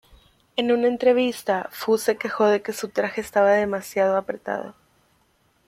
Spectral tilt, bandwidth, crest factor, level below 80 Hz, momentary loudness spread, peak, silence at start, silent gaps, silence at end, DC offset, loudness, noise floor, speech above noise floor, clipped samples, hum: -4.5 dB/octave; 16 kHz; 18 dB; -62 dBFS; 10 LU; -6 dBFS; 0.55 s; none; 0.95 s; under 0.1%; -22 LUFS; -64 dBFS; 42 dB; under 0.1%; none